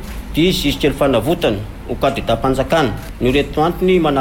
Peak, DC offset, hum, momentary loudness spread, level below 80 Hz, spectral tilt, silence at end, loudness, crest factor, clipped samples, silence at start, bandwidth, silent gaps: -4 dBFS; under 0.1%; none; 6 LU; -30 dBFS; -6 dB/octave; 0 s; -16 LUFS; 12 dB; under 0.1%; 0 s; 17 kHz; none